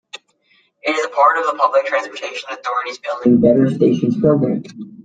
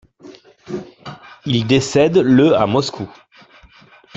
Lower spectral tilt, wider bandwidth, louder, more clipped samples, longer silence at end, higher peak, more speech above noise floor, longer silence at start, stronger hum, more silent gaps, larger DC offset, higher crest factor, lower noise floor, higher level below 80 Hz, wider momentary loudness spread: about the same, -6.5 dB/octave vs -6 dB/octave; first, 9 kHz vs 8 kHz; about the same, -17 LUFS vs -15 LUFS; neither; second, 0.05 s vs 1.1 s; about the same, -2 dBFS vs -2 dBFS; first, 43 dB vs 33 dB; about the same, 0.15 s vs 0.25 s; neither; neither; neither; about the same, 16 dB vs 16 dB; first, -59 dBFS vs -47 dBFS; second, -58 dBFS vs -52 dBFS; second, 13 LU vs 21 LU